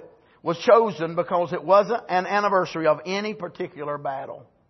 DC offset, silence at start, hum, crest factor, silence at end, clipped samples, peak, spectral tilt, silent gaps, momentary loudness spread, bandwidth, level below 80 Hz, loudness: under 0.1%; 0 s; none; 20 dB; 0.3 s; under 0.1%; -4 dBFS; -5.5 dB/octave; none; 14 LU; 6.2 kHz; -70 dBFS; -23 LUFS